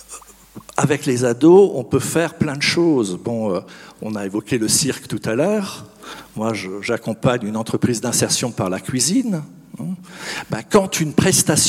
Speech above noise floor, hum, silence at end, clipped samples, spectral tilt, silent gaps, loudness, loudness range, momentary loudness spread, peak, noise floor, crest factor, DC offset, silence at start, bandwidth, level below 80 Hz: 23 dB; none; 0 s; under 0.1%; -4 dB/octave; none; -18 LUFS; 5 LU; 15 LU; 0 dBFS; -42 dBFS; 18 dB; under 0.1%; 0.1 s; 16.5 kHz; -52 dBFS